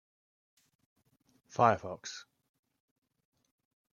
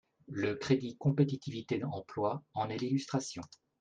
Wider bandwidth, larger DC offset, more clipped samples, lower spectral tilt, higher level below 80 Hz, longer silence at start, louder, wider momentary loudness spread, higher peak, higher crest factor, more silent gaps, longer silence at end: second, 7.4 kHz vs 9.4 kHz; neither; neither; second, -5 dB/octave vs -6.5 dB/octave; second, -78 dBFS vs -70 dBFS; first, 1.55 s vs 0.3 s; first, -30 LUFS vs -35 LUFS; first, 17 LU vs 11 LU; first, -10 dBFS vs -16 dBFS; first, 28 dB vs 20 dB; neither; first, 1.75 s vs 0.35 s